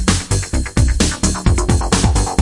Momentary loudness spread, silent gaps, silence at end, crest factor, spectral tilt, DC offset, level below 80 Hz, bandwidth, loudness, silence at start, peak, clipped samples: 4 LU; none; 0 s; 14 dB; -4.5 dB/octave; under 0.1%; -20 dBFS; 11.5 kHz; -16 LUFS; 0 s; 0 dBFS; under 0.1%